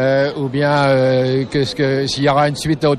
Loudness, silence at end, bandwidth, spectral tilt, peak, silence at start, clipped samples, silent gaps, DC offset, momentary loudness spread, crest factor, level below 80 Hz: -16 LUFS; 0 s; 12.5 kHz; -6 dB/octave; -4 dBFS; 0 s; under 0.1%; none; under 0.1%; 4 LU; 12 dB; -46 dBFS